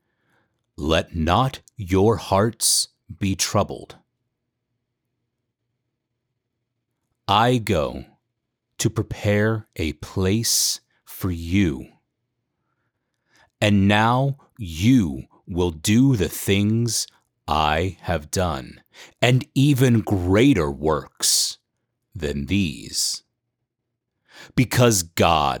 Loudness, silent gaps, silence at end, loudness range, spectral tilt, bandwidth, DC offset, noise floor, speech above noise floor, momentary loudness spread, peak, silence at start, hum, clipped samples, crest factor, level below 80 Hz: -21 LUFS; none; 0 s; 6 LU; -4.5 dB/octave; over 20 kHz; under 0.1%; -80 dBFS; 60 dB; 13 LU; -4 dBFS; 0.8 s; none; under 0.1%; 20 dB; -42 dBFS